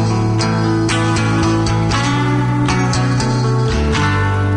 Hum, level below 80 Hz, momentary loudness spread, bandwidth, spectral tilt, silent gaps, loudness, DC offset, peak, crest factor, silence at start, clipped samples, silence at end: none; -30 dBFS; 1 LU; 11 kHz; -6 dB/octave; none; -15 LUFS; under 0.1%; -4 dBFS; 10 dB; 0 s; under 0.1%; 0 s